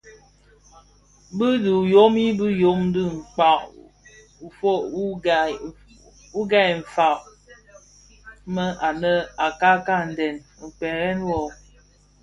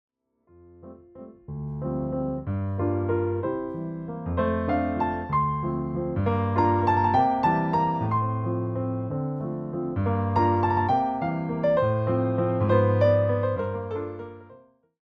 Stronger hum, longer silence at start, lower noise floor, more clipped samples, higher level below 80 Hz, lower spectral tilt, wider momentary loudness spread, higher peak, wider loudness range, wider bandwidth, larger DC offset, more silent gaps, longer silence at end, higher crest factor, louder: first, 50 Hz at -50 dBFS vs none; second, 0.05 s vs 0.8 s; second, -55 dBFS vs -60 dBFS; neither; about the same, -52 dBFS vs -52 dBFS; second, -6 dB/octave vs -10 dB/octave; first, 15 LU vs 11 LU; first, -2 dBFS vs -8 dBFS; about the same, 4 LU vs 6 LU; first, 11 kHz vs 5.8 kHz; neither; neither; first, 0.7 s vs 0.5 s; about the same, 20 dB vs 18 dB; first, -21 LUFS vs -25 LUFS